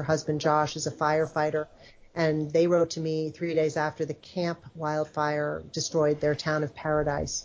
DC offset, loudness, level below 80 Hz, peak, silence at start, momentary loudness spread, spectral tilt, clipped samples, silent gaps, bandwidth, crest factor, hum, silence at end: under 0.1%; -28 LUFS; -54 dBFS; -12 dBFS; 0 s; 7 LU; -5 dB/octave; under 0.1%; none; 7.8 kHz; 16 dB; none; 0 s